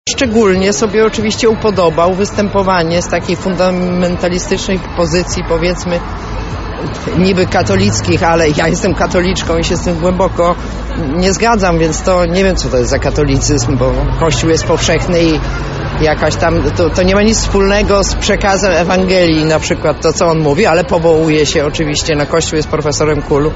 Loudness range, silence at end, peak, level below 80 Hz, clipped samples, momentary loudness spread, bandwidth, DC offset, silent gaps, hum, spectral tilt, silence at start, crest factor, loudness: 3 LU; 0 s; 0 dBFS; -24 dBFS; under 0.1%; 5 LU; 8 kHz; under 0.1%; none; none; -5 dB/octave; 0.05 s; 12 dB; -12 LUFS